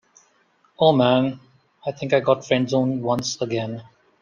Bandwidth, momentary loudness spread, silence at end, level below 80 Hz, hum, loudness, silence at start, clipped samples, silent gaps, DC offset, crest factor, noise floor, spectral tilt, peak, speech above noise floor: 9.8 kHz; 15 LU; 0.4 s; -62 dBFS; none; -21 LUFS; 0.8 s; under 0.1%; none; under 0.1%; 20 dB; -62 dBFS; -5.5 dB/octave; -2 dBFS; 41 dB